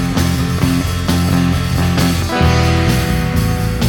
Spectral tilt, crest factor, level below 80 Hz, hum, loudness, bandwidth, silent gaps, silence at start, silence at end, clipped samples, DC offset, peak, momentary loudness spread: -5.5 dB/octave; 14 dB; -24 dBFS; none; -15 LUFS; 19 kHz; none; 0 s; 0 s; under 0.1%; under 0.1%; 0 dBFS; 3 LU